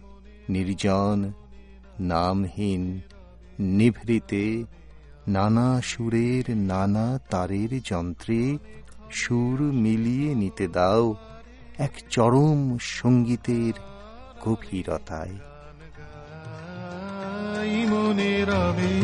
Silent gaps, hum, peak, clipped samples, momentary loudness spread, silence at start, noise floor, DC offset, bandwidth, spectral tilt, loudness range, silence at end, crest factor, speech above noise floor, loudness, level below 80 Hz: none; none; -6 dBFS; under 0.1%; 17 LU; 0 s; -46 dBFS; under 0.1%; 11 kHz; -7 dB/octave; 7 LU; 0 s; 18 dB; 22 dB; -25 LUFS; -48 dBFS